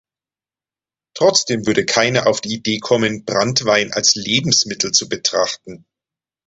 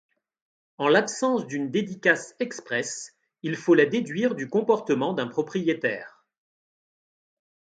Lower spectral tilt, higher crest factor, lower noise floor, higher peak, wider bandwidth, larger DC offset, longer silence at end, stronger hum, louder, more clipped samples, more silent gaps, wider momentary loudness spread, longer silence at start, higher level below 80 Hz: second, -2.5 dB/octave vs -4.5 dB/octave; about the same, 18 dB vs 22 dB; about the same, under -90 dBFS vs under -90 dBFS; first, 0 dBFS vs -6 dBFS; second, 8.2 kHz vs 9.4 kHz; neither; second, 0.7 s vs 1.65 s; neither; first, -16 LUFS vs -25 LUFS; neither; neither; second, 7 LU vs 12 LU; first, 1.15 s vs 0.8 s; first, -54 dBFS vs -74 dBFS